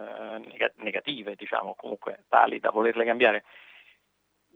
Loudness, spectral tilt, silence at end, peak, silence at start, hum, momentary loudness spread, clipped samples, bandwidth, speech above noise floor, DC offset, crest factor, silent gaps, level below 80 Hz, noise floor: -26 LUFS; -5.5 dB/octave; 1 s; -4 dBFS; 0 s; 50 Hz at -80 dBFS; 15 LU; under 0.1%; 5.2 kHz; 47 dB; under 0.1%; 24 dB; none; -86 dBFS; -73 dBFS